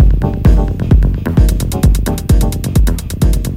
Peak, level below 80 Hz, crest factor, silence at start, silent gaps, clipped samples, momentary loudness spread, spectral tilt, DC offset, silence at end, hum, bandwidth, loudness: 0 dBFS; -12 dBFS; 10 dB; 0 s; none; under 0.1%; 3 LU; -7 dB/octave; under 0.1%; 0 s; none; 16 kHz; -14 LUFS